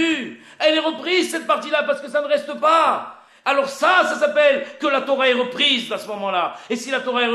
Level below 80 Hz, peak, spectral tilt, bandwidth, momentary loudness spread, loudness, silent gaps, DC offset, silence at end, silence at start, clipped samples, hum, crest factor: -70 dBFS; -4 dBFS; -2.5 dB/octave; 13.5 kHz; 9 LU; -19 LUFS; none; under 0.1%; 0 s; 0 s; under 0.1%; none; 16 dB